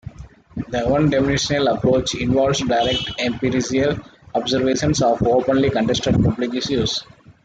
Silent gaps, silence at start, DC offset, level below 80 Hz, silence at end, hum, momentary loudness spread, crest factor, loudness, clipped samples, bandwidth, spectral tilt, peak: none; 0.05 s; under 0.1%; -40 dBFS; 0.15 s; none; 8 LU; 14 dB; -19 LUFS; under 0.1%; 9.2 kHz; -5 dB/octave; -6 dBFS